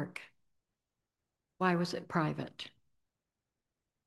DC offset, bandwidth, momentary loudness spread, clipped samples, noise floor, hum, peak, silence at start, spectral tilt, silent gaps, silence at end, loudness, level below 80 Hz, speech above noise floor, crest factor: under 0.1%; 12 kHz; 16 LU; under 0.1%; -89 dBFS; none; -14 dBFS; 0 s; -6.5 dB/octave; none; 1.4 s; -35 LUFS; -78 dBFS; 55 dB; 26 dB